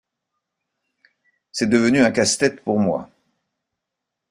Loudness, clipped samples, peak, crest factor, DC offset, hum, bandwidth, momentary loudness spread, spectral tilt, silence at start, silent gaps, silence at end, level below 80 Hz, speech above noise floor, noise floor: -19 LUFS; under 0.1%; -4 dBFS; 18 dB; under 0.1%; none; 15 kHz; 10 LU; -4 dB/octave; 1.55 s; none; 1.25 s; -58 dBFS; 64 dB; -82 dBFS